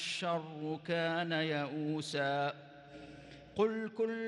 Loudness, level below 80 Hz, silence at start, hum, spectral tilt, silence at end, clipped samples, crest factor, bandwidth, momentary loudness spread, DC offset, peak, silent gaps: -36 LUFS; -72 dBFS; 0 s; none; -5 dB/octave; 0 s; under 0.1%; 18 dB; 11.5 kHz; 18 LU; under 0.1%; -20 dBFS; none